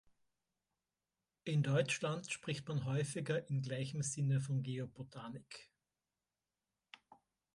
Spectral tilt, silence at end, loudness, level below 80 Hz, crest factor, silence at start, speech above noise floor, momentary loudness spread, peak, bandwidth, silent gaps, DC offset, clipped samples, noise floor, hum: -5.5 dB/octave; 1.9 s; -39 LUFS; -76 dBFS; 20 dB; 1.45 s; over 51 dB; 15 LU; -22 dBFS; 11.5 kHz; none; under 0.1%; under 0.1%; under -90 dBFS; none